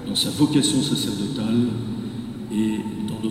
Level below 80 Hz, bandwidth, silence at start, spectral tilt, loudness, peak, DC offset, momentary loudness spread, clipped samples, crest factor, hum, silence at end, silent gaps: -50 dBFS; 16 kHz; 0 s; -4.5 dB/octave; -23 LUFS; -6 dBFS; under 0.1%; 11 LU; under 0.1%; 16 dB; none; 0 s; none